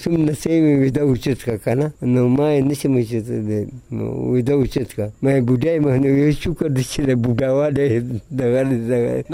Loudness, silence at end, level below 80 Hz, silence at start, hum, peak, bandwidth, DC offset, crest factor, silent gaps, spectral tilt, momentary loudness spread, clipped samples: -19 LUFS; 0 s; -40 dBFS; 0 s; none; -6 dBFS; 16 kHz; under 0.1%; 12 dB; none; -7.5 dB/octave; 7 LU; under 0.1%